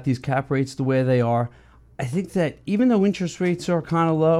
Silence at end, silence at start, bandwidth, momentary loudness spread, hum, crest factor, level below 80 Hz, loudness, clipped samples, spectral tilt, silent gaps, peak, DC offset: 0 s; 0 s; 12 kHz; 6 LU; none; 14 dB; -54 dBFS; -22 LUFS; under 0.1%; -7.5 dB/octave; none; -8 dBFS; under 0.1%